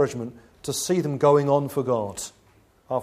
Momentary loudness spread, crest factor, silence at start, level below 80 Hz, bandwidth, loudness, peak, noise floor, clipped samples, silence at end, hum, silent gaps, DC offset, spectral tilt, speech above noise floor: 17 LU; 18 dB; 0 s; -60 dBFS; 15.5 kHz; -23 LUFS; -6 dBFS; -58 dBFS; under 0.1%; 0 s; none; none; under 0.1%; -5.5 dB/octave; 35 dB